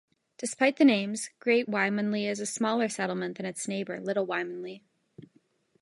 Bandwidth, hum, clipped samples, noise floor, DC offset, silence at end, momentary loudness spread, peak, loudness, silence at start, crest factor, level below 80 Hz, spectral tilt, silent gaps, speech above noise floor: 11.5 kHz; none; under 0.1%; -67 dBFS; under 0.1%; 0.55 s; 13 LU; -10 dBFS; -28 LUFS; 0.4 s; 20 dB; -80 dBFS; -4 dB/octave; none; 39 dB